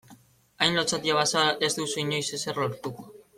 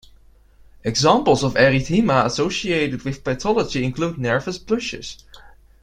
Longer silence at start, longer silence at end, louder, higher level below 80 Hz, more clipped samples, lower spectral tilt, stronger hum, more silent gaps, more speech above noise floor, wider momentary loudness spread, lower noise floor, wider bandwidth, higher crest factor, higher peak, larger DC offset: second, 0.1 s vs 0.85 s; second, 0.15 s vs 0.35 s; second, -25 LUFS vs -20 LUFS; second, -64 dBFS vs -44 dBFS; neither; second, -2.5 dB/octave vs -5 dB/octave; neither; neither; about the same, 28 dB vs 31 dB; about the same, 11 LU vs 10 LU; first, -55 dBFS vs -50 dBFS; about the same, 16.5 kHz vs 15 kHz; about the same, 22 dB vs 18 dB; second, -6 dBFS vs -2 dBFS; neither